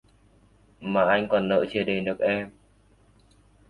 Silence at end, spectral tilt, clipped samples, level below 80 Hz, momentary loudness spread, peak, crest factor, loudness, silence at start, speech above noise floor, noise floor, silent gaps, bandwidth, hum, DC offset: 1.2 s; -7.5 dB/octave; under 0.1%; -58 dBFS; 9 LU; -8 dBFS; 18 dB; -25 LUFS; 0.8 s; 35 dB; -59 dBFS; none; 10.5 kHz; none; under 0.1%